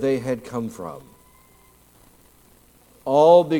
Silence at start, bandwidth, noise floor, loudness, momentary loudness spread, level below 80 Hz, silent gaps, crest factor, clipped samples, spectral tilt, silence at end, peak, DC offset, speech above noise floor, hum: 0 s; 16.5 kHz; -54 dBFS; -20 LUFS; 22 LU; -60 dBFS; none; 20 dB; under 0.1%; -6.5 dB/octave; 0 s; -2 dBFS; under 0.1%; 35 dB; 60 Hz at -60 dBFS